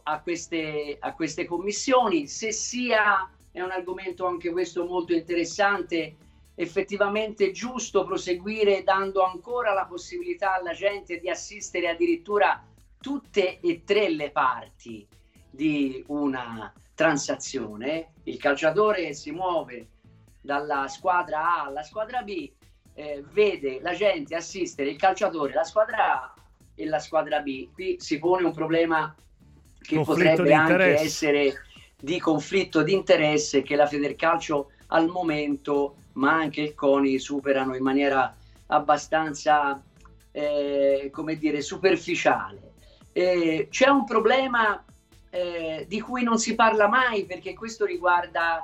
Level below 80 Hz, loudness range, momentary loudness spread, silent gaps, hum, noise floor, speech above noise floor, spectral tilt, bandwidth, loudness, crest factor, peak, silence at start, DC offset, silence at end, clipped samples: -58 dBFS; 5 LU; 12 LU; none; none; -55 dBFS; 30 dB; -4 dB/octave; 14 kHz; -25 LUFS; 20 dB; -6 dBFS; 0.05 s; under 0.1%; 0 s; under 0.1%